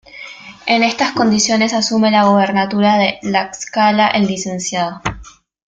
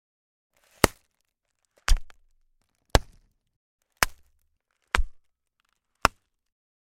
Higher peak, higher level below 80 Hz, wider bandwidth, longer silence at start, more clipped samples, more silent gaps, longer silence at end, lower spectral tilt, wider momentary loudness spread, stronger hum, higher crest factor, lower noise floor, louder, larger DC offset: about the same, -2 dBFS vs 0 dBFS; second, -46 dBFS vs -34 dBFS; second, 9.2 kHz vs 16.5 kHz; second, 0.15 s vs 0.85 s; neither; second, none vs 3.56-3.79 s; second, 0.5 s vs 0.7 s; about the same, -4 dB/octave vs -3.5 dB/octave; first, 13 LU vs 6 LU; neither; second, 14 dB vs 30 dB; second, -39 dBFS vs -77 dBFS; first, -15 LUFS vs -27 LUFS; neither